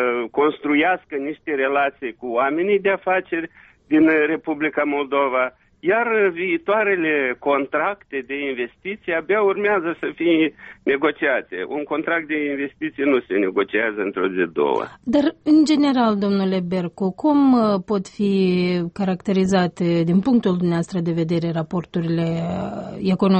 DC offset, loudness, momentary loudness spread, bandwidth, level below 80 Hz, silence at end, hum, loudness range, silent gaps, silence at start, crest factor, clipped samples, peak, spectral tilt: under 0.1%; -20 LUFS; 9 LU; 8.4 kHz; -58 dBFS; 0 s; none; 3 LU; none; 0 s; 14 dB; under 0.1%; -6 dBFS; -7 dB/octave